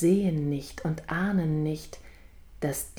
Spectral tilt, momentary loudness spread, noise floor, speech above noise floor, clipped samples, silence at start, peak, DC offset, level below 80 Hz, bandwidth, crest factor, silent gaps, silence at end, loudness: -6.5 dB/octave; 12 LU; -49 dBFS; 22 dB; under 0.1%; 0 s; -12 dBFS; under 0.1%; -50 dBFS; over 20 kHz; 16 dB; none; 0 s; -29 LUFS